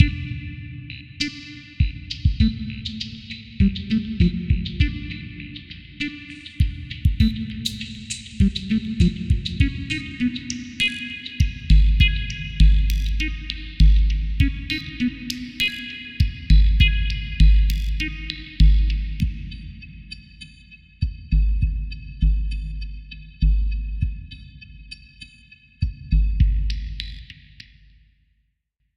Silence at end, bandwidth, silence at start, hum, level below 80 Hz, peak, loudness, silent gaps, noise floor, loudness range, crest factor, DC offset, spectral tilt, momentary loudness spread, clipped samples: 1.65 s; 9.6 kHz; 0 s; none; -22 dBFS; 0 dBFS; -23 LUFS; none; -72 dBFS; 7 LU; 20 dB; under 0.1%; -5.5 dB/octave; 20 LU; under 0.1%